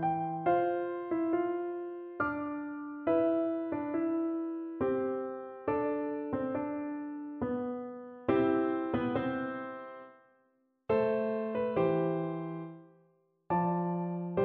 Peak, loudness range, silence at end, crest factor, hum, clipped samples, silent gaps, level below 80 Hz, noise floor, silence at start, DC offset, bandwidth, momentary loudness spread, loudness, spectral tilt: -16 dBFS; 2 LU; 0 s; 18 dB; none; under 0.1%; none; -66 dBFS; -73 dBFS; 0 s; under 0.1%; 4.3 kHz; 11 LU; -33 LUFS; -11 dB/octave